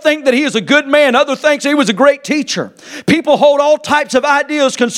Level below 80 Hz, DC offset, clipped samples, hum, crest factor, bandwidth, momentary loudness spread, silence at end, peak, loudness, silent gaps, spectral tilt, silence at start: -56 dBFS; under 0.1%; under 0.1%; none; 12 dB; 14 kHz; 7 LU; 0 s; 0 dBFS; -12 LUFS; none; -3.5 dB/octave; 0 s